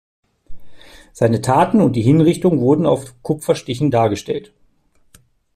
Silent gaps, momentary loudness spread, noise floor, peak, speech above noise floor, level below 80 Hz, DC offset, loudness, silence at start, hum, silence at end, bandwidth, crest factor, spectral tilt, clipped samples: none; 10 LU; -56 dBFS; -2 dBFS; 40 dB; -48 dBFS; under 0.1%; -16 LUFS; 0.5 s; none; 1.1 s; 14 kHz; 16 dB; -7 dB/octave; under 0.1%